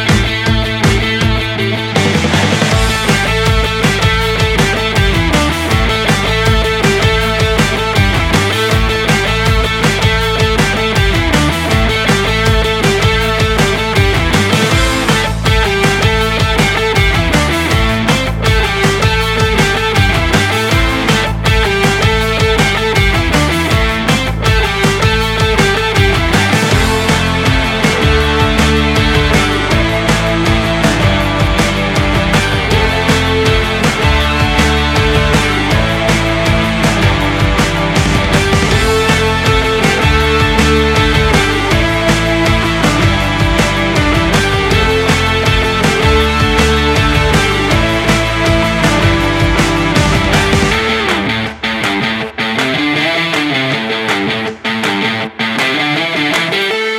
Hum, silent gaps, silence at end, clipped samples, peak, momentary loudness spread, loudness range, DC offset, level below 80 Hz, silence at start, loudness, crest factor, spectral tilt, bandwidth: none; none; 0 s; under 0.1%; 0 dBFS; 2 LU; 1 LU; under 0.1%; -20 dBFS; 0 s; -11 LUFS; 12 dB; -4.5 dB/octave; 17 kHz